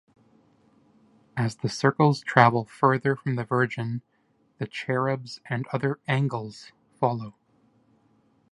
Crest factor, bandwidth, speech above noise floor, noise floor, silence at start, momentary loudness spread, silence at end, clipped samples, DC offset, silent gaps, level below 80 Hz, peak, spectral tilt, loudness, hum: 26 dB; 11.5 kHz; 42 dB; -66 dBFS; 1.35 s; 15 LU; 1.2 s; under 0.1%; under 0.1%; none; -66 dBFS; 0 dBFS; -6.5 dB/octave; -25 LUFS; none